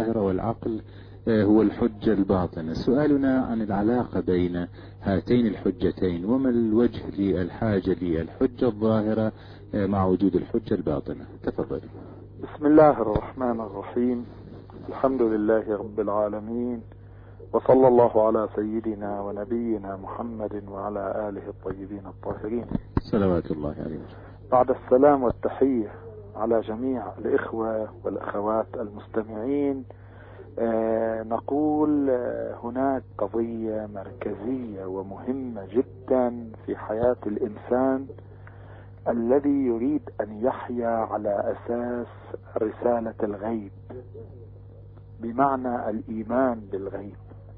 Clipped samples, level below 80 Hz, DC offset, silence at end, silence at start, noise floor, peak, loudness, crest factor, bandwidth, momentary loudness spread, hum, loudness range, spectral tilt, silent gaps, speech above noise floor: under 0.1%; -48 dBFS; under 0.1%; 0 s; 0 s; -45 dBFS; -6 dBFS; -25 LUFS; 20 dB; 5.4 kHz; 16 LU; 50 Hz at -45 dBFS; 7 LU; -10.5 dB/octave; none; 20 dB